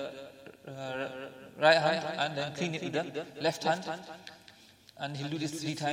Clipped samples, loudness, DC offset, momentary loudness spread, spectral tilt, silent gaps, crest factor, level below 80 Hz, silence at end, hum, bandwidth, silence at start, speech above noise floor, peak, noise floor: under 0.1%; -32 LUFS; under 0.1%; 21 LU; -4.5 dB/octave; none; 24 dB; -76 dBFS; 0 s; none; 16 kHz; 0 s; 25 dB; -10 dBFS; -57 dBFS